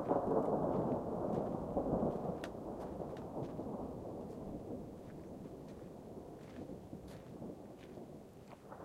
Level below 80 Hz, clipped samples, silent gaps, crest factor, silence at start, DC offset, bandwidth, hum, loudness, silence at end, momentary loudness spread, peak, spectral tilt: -60 dBFS; under 0.1%; none; 22 dB; 0 s; under 0.1%; 16 kHz; none; -42 LUFS; 0 s; 16 LU; -20 dBFS; -8.5 dB/octave